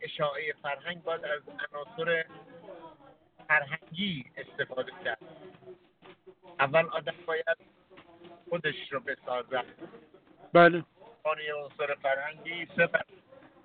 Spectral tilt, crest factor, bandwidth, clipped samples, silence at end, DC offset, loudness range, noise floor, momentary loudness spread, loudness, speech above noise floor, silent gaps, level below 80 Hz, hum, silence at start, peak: -2.5 dB/octave; 24 dB; 4.5 kHz; under 0.1%; 0.6 s; under 0.1%; 7 LU; -58 dBFS; 21 LU; -30 LUFS; 27 dB; none; -74 dBFS; none; 0 s; -8 dBFS